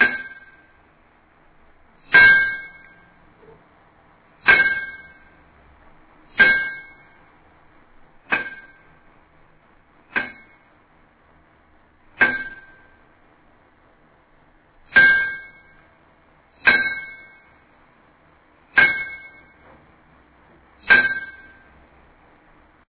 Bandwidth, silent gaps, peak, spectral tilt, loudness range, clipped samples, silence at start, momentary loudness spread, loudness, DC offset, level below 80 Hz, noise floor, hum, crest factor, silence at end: 4 kHz; none; -2 dBFS; 0.5 dB/octave; 12 LU; under 0.1%; 0 s; 25 LU; -17 LUFS; under 0.1%; -54 dBFS; -56 dBFS; none; 22 dB; 1.6 s